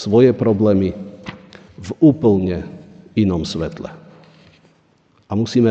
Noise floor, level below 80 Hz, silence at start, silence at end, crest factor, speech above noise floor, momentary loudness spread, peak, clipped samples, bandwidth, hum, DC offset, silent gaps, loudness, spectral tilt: -57 dBFS; -46 dBFS; 0 s; 0 s; 16 dB; 41 dB; 21 LU; -2 dBFS; under 0.1%; 8.4 kHz; none; under 0.1%; none; -17 LUFS; -8 dB/octave